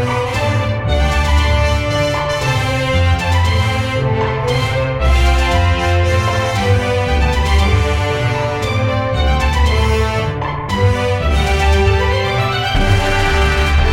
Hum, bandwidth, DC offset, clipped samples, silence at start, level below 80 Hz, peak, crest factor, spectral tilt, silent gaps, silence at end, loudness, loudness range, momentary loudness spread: none; 13.5 kHz; under 0.1%; under 0.1%; 0 s; -18 dBFS; -2 dBFS; 12 dB; -5.5 dB/octave; none; 0 s; -15 LUFS; 1 LU; 3 LU